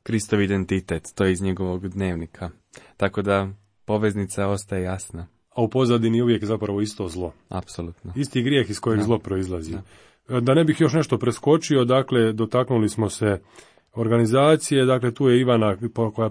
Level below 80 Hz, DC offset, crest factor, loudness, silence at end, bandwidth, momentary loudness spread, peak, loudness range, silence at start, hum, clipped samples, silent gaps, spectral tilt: -50 dBFS; under 0.1%; 18 dB; -22 LUFS; 0 s; 10.5 kHz; 14 LU; -4 dBFS; 5 LU; 0.05 s; none; under 0.1%; none; -6.5 dB/octave